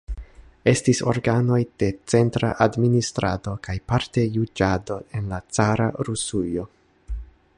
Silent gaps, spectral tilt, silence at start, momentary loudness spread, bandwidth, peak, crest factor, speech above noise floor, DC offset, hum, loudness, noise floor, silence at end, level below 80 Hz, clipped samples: none; -6 dB/octave; 0.1 s; 12 LU; 11.5 kHz; -4 dBFS; 20 dB; 20 dB; under 0.1%; none; -23 LUFS; -42 dBFS; 0.3 s; -40 dBFS; under 0.1%